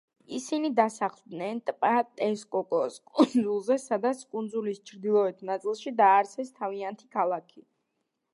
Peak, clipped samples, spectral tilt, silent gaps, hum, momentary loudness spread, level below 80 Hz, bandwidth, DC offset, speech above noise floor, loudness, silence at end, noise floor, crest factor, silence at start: -8 dBFS; under 0.1%; -5 dB/octave; none; none; 11 LU; -84 dBFS; 11.5 kHz; under 0.1%; 53 dB; -28 LUFS; 0.75 s; -80 dBFS; 20 dB; 0.3 s